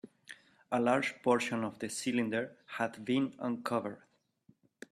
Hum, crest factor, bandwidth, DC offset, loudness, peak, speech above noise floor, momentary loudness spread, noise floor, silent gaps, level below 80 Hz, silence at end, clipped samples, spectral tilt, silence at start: none; 20 dB; 13.5 kHz; under 0.1%; -34 LUFS; -14 dBFS; 35 dB; 21 LU; -68 dBFS; none; -76 dBFS; 0.95 s; under 0.1%; -4.5 dB/octave; 0.05 s